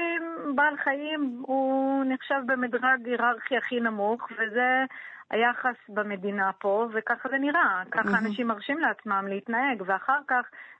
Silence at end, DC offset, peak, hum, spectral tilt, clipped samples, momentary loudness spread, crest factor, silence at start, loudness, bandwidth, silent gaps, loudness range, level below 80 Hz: 0.05 s; under 0.1%; -10 dBFS; none; -7 dB/octave; under 0.1%; 6 LU; 16 dB; 0 s; -27 LUFS; 8 kHz; none; 1 LU; -78 dBFS